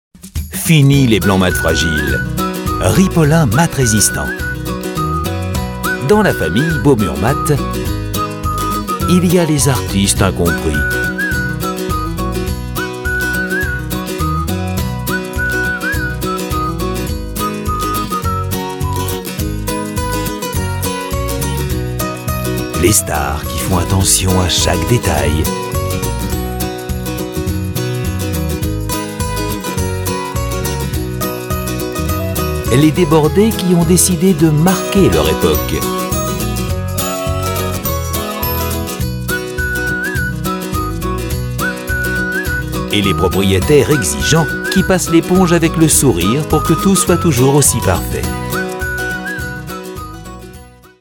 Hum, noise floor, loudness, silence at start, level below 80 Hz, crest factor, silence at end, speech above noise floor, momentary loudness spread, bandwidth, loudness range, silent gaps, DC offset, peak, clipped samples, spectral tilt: none; -37 dBFS; -15 LUFS; 0.15 s; -28 dBFS; 14 dB; 0.3 s; 25 dB; 9 LU; 17.5 kHz; 7 LU; none; under 0.1%; 0 dBFS; under 0.1%; -4.5 dB/octave